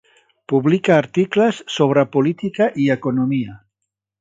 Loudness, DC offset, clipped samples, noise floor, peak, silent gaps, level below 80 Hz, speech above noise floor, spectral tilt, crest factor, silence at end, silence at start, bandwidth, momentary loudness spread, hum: -18 LUFS; under 0.1%; under 0.1%; -80 dBFS; 0 dBFS; none; -62 dBFS; 63 dB; -7 dB/octave; 18 dB; 0.65 s; 0.5 s; 7.8 kHz; 6 LU; none